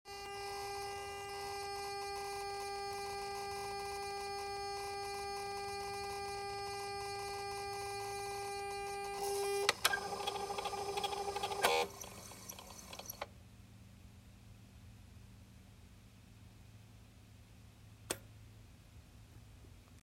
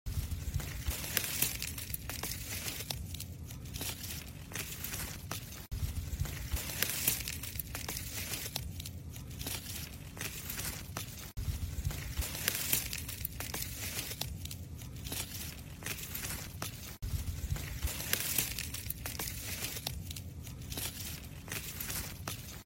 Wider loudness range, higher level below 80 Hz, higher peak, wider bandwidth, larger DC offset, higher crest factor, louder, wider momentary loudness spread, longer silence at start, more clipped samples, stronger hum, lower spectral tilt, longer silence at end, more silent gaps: first, 22 LU vs 4 LU; second, -64 dBFS vs -48 dBFS; second, -12 dBFS vs -8 dBFS; about the same, 16 kHz vs 16.5 kHz; neither; about the same, 32 dB vs 32 dB; second, -41 LUFS vs -38 LUFS; first, 23 LU vs 11 LU; about the same, 0.05 s vs 0.05 s; neither; neither; about the same, -2 dB/octave vs -2.5 dB/octave; about the same, 0 s vs 0 s; neither